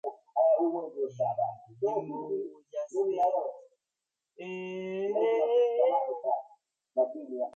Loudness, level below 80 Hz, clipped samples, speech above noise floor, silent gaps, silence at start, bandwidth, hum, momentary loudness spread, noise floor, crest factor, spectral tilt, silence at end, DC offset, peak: -30 LUFS; -84 dBFS; under 0.1%; 58 dB; none; 0.05 s; 7.8 kHz; none; 12 LU; -88 dBFS; 16 dB; -7 dB/octave; 0.05 s; under 0.1%; -14 dBFS